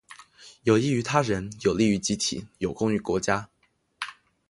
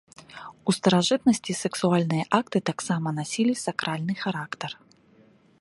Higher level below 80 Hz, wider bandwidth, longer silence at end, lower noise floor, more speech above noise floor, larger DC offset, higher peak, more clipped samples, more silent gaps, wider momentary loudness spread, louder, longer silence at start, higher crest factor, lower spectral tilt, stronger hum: first, -54 dBFS vs -66 dBFS; about the same, 11.5 kHz vs 11.5 kHz; second, 0.4 s vs 0.9 s; second, -51 dBFS vs -58 dBFS; second, 26 dB vs 33 dB; neither; about the same, -6 dBFS vs -6 dBFS; neither; neither; about the same, 14 LU vs 14 LU; about the same, -25 LUFS vs -25 LUFS; about the same, 0.1 s vs 0.2 s; about the same, 20 dB vs 22 dB; about the same, -5 dB/octave vs -5 dB/octave; neither